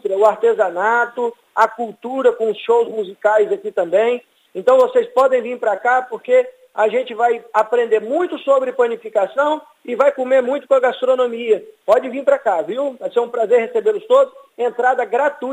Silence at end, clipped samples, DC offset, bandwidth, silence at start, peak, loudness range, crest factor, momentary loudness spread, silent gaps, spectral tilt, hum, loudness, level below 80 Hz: 0 s; under 0.1%; under 0.1%; 9.2 kHz; 0.05 s; 0 dBFS; 1 LU; 16 dB; 6 LU; none; -4.5 dB/octave; none; -17 LUFS; -70 dBFS